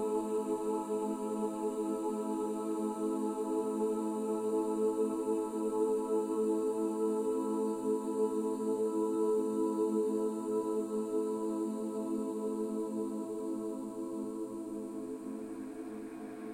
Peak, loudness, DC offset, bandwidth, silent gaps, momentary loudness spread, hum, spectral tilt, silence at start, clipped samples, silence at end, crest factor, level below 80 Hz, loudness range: -20 dBFS; -35 LUFS; under 0.1%; 16 kHz; none; 9 LU; none; -6.5 dB/octave; 0 s; under 0.1%; 0 s; 14 dB; -74 dBFS; 5 LU